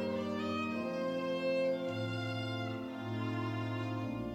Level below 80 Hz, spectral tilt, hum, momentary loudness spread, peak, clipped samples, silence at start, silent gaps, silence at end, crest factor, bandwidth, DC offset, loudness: -66 dBFS; -7 dB/octave; none; 5 LU; -24 dBFS; under 0.1%; 0 s; none; 0 s; 12 dB; 14 kHz; under 0.1%; -37 LUFS